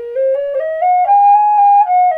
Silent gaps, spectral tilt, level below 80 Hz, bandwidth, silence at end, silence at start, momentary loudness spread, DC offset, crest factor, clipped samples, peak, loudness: none; -3.5 dB/octave; -60 dBFS; 3.4 kHz; 0 s; 0 s; 8 LU; under 0.1%; 8 dB; under 0.1%; -2 dBFS; -11 LUFS